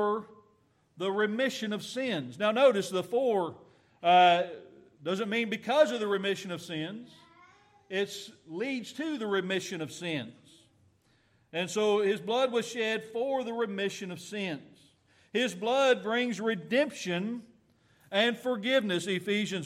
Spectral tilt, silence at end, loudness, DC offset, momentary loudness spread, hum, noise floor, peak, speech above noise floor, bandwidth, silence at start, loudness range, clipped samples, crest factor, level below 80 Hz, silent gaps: -4.5 dB/octave; 0 s; -30 LUFS; under 0.1%; 12 LU; none; -68 dBFS; -12 dBFS; 39 dB; 15 kHz; 0 s; 8 LU; under 0.1%; 20 dB; -80 dBFS; none